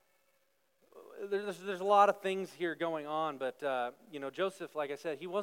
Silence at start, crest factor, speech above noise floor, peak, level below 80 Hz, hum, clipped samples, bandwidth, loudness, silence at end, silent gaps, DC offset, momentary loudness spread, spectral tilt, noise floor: 0.95 s; 22 dB; 42 dB; -12 dBFS; under -90 dBFS; none; under 0.1%; 16.5 kHz; -34 LUFS; 0 s; none; under 0.1%; 14 LU; -5 dB/octave; -76 dBFS